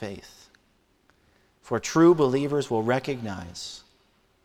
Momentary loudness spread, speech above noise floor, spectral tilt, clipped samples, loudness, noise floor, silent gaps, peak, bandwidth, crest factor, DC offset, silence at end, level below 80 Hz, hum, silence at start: 19 LU; 41 dB; -6 dB/octave; under 0.1%; -24 LUFS; -66 dBFS; none; -8 dBFS; 13 kHz; 18 dB; under 0.1%; 0.65 s; -60 dBFS; none; 0 s